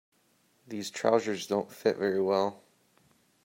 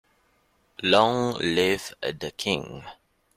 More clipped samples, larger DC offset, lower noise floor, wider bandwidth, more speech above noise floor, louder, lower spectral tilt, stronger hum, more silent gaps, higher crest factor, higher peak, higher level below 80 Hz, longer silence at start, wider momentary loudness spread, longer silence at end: neither; neither; about the same, -69 dBFS vs -66 dBFS; about the same, 16 kHz vs 16 kHz; about the same, 40 dB vs 42 dB; second, -30 LUFS vs -24 LUFS; about the same, -4.5 dB/octave vs -4 dB/octave; neither; neither; about the same, 22 dB vs 22 dB; second, -10 dBFS vs -4 dBFS; second, -78 dBFS vs -60 dBFS; about the same, 0.7 s vs 0.8 s; second, 10 LU vs 18 LU; first, 0.9 s vs 0.45 s